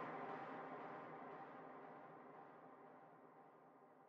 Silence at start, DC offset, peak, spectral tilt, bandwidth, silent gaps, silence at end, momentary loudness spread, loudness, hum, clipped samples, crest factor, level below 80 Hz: 0 s; under 0.1%; -38 dBFS; -4.5 dB/octave; 6.8 kHz; none; 0 s; 15 LU; -56 LUFS; none; under 0.1%; 18 dB; under -90 dBFS